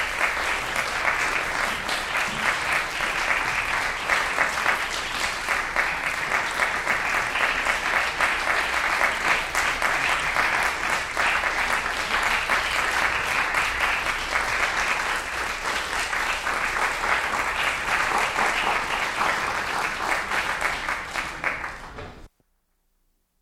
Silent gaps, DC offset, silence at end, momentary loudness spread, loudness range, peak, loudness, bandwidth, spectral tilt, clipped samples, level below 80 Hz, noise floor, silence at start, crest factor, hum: none; under 0.1%; 1.15 s; 4 LU; 2 LU; -6 dBFS; -23 LUFS; 16.5 kHz; -1.5 dB/octave; under 0.1%; -44 dBFS; -70 dBFS; 0 s; 18 dB; none